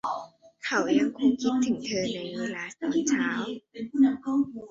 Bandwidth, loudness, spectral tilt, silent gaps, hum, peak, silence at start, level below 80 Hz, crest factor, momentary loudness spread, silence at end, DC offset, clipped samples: 7.8 kHz; -27 LUFS; -4 dB/octave; none; none; -12 dBFS; 0.05 s; -66 dBFS; 16 dB; 10 LU; 0 s; under 0.1%; under 0.1%